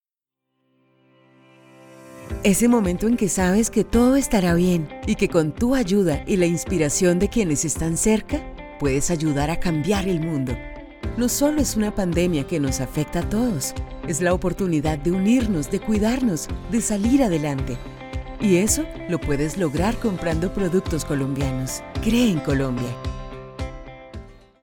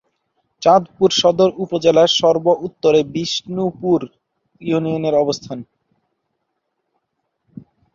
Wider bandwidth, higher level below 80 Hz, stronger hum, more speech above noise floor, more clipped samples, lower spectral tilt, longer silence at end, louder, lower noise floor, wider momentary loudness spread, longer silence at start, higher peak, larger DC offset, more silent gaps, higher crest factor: first, 19 kHz vs 7.6 kHz; first, -34 dBFS vs -58 dBFS; neither; first, 64 dB vs 57 dB; neither; about the same, -5.5 dB/octave vs -5 dB/octave; second, 0.3 s vs 2.3 s; second, -22 LUFS vs -16 LUFS; first, -84 dBFS vs -73 dBFS; first, 13 LU vs 10 LU; first, 1.9 s vs 0.6 s; about the same, -4 dBFS vs -2 dBFS; neither; neither; about the same, 16 dB vs 18 dB